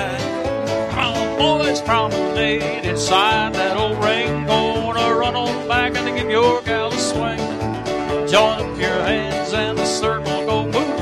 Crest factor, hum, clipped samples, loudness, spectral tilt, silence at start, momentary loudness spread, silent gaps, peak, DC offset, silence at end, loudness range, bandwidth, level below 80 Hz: 18 dB; none; under 0.1%; -19 LUFS; -4 dB/octave; 0 s; 6 LU; none; -2 dBFS; under 0.1%; 0 s; 2 LU; 14.5 kHz; -40 dBFS